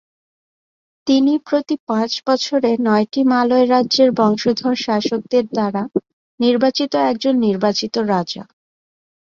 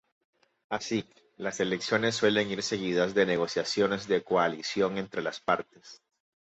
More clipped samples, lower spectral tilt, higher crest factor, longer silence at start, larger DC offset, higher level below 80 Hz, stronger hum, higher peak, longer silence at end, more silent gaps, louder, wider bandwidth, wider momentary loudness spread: neither; about the same, -5 dB/octave vs -4 dB/octave; about the same, 16 dB vs 20 dB; first, 1.05 s vs 0.7 s; neither; about the same, -62 dBFS vs -66 dBFS; neither; first, -2 dBFS vs -10 dBFS; first, 0.9 s vs 0.5 s; first, 1.80-1.87 s, 6.13-6.38 s vs none; first, -17 LUFS vs -29 LUFS; second, 7.4 kHz vs 8.2 kHz; about the same, 6 LU vs 8 LU